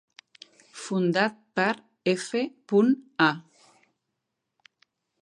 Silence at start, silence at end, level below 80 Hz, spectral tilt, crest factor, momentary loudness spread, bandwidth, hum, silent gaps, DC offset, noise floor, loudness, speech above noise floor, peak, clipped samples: 0.75 s; 1.8 s; -80 dBFS; -5.5 dB/octave; 24 dB; 10 LU; 11.5 kHz; none; none; under 0.1%; -82 dBFS; -26 LUFS; 57 dB; -6 dBFS; under 0.1%